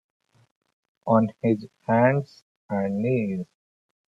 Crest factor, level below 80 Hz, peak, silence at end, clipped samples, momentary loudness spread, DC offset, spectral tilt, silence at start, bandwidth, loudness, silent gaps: 20 dB; -66 dBFS; -6 dBFS; 0.7 s; under 0.1%; 15 LU; under 0.1%; -10 dB/octave; 1.05 s; 7.2 kHz; -24 LUFS; 2.42-2.69 s